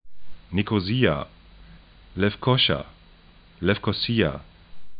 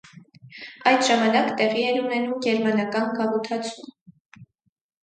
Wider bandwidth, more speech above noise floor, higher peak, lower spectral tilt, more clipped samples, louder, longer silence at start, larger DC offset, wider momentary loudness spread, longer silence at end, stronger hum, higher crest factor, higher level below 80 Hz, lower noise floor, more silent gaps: second, 5.2 kHz vs 9.4 kHz; about the same, 29 dB vs 31 dB; about the same, -6 dBFS vs -4 dBFS; first, -10.5 dB/octave vs -4 dB/octave; neither; about the same, -24 LUFS vs -22 LUFS; about the same, 0.05 s vs 0.15 s; neither; first, 18 LU vs 13 LU; second, 0 s vs 0.6 s; neither; about the same, 20 dB vs 20 dB; first, -48 dBFS vs -74 dBFS; about the same, -52 dBFS vs -53 dBFS; second, none vs 4.01-4.06 s, 4.20-4.25 s